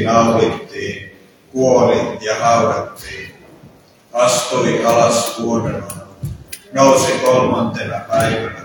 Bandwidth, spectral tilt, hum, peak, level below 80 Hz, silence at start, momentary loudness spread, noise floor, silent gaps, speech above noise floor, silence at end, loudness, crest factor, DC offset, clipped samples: 19 kHz; -4.5 dB/octave; none; 0 dBFS; -46 dBFS; 0 s; 17 LU; -45 dBFS; none; 30 dB; 0 s; -15 LUFS; 16 dB; under 0.1%; under 0.1%